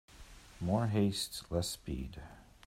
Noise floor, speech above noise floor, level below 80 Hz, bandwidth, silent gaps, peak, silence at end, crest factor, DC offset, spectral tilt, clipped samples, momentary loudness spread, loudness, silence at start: -55 dBFS; 20 dB; -52 dBFS; 16 kHz; none; -18 dBFS; 0.2 s; 18 dB; under 0.1%; -5.5 dB/octave; under 0.1%; 23 LU; -36 LUFS; 0.1 s